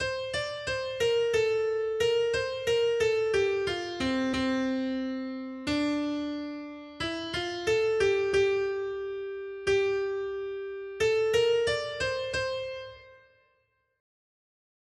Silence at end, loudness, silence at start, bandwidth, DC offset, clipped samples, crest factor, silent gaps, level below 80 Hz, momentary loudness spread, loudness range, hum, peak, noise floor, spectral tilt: 1.85 s; -29 LUFS; 0 s; 12.5 kHz; under 0.1%; under 0.1%; 16 dB; none; -56 dBFS; 10 LU; 4 LU; none; -14 dBFS; -73 dBFS; -4 dB/octave